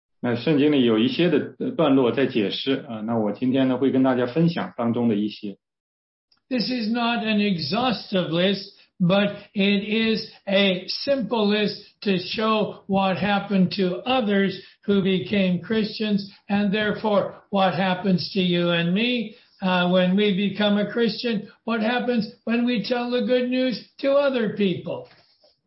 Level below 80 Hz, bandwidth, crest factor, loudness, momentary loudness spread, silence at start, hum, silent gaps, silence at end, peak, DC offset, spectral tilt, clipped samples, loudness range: -64 dBFS; 5.8 kHz; 16 dB; -22 LUFS; 7 LU; 0.25 s; none; 5.80-6.28 s; 0.6 s; -6 dBFS; under 0.1%; -9.5 dB/octave; under 0.1%; 3 LU